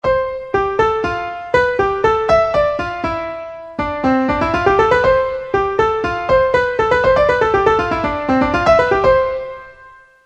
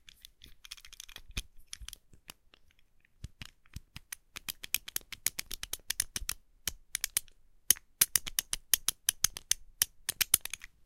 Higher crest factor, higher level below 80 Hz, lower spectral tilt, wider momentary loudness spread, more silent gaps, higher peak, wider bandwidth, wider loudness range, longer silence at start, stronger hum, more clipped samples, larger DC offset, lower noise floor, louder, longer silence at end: second, 16 dB vs 36 dB; first, -36 dBFS vs -54 dBFS; first, -6 dB/octave vs 1 dB/octave; second, 9 LU vs 22 LU; neither; about the same, 0 dBFS vs -2 dBFS; second, 8.4 kHz vs 17 kHz; second, 3 LU vs 18 LU; second, 0.05 s vs 0.45 s; neither; neither; neither; second, -43 dBFS vs -64 dBFS; first, -15 LUFS vs -32 LUFS; about the same, 0.35 s vs 0.3 s